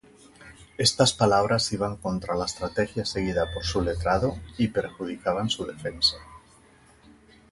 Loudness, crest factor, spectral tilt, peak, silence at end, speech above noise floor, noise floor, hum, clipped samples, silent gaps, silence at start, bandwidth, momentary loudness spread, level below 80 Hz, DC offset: -26 LUFS; 22 dB; -4 dB/octave; -6 dBFS; 1.15 s; 30 dB; -56 dBFS; none; under 0.1%; none; 0.4 s; 11.5 kHz; 9 LU; -44 dBFS; under 0.1%